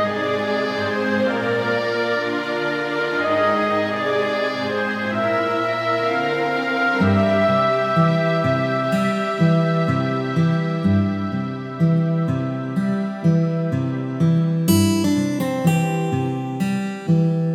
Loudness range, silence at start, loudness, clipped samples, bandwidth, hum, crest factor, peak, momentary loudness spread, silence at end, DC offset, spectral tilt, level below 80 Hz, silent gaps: 2 LU; 0 s; -20 LUFS; under 0.1%; 15 kHz; none; 16 dB; -4 dBFS; 5 LU; 0 s; under 0.1%; -6.5 dB/octave; -64 dBFS; none